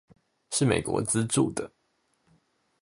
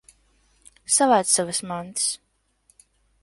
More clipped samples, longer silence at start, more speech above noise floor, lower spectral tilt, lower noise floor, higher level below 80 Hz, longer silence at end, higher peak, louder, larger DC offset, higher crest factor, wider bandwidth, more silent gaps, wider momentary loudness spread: neither; second, 0.5 s vs 0.9 s; first, 46 dB vs 42 dB; first, -4.5 dB/octave vs -2 dB/octave; first, -73 dBFS vs -64 dBFS; first, -56 dBFS vs -64 dBFS; about the same, 1.15 s vs 1.05 s; second, -8 dBFS vs -4 dBFS; second, -27 LUFS vs -21 LUFS; neither; about the same, 22 dB vs 22 dB; about the same, 11.5 kHz vs 12 kHz; neither; second, 10 LU vs 15 LU